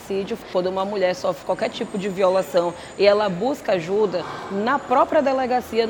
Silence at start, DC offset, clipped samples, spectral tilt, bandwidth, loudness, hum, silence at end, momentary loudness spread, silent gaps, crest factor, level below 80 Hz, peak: 0 s; under 0.1%; under 0.1%; -5.5 dB/octave; 20 kHz; -22 LUFS; none; 0 s; 9 LU; none; 18 dB; -56 dBFS; -2 dBFS